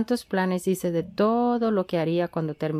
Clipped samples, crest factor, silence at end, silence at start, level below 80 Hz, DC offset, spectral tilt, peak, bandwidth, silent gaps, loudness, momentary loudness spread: under 0.1%; 14 dB; 0 s; 0 s; -62 dBFS; under 0.1%; -6.5 dB/octave; -10 dBFS; 15.5 kHz; none; -25 LUFS; 5 LU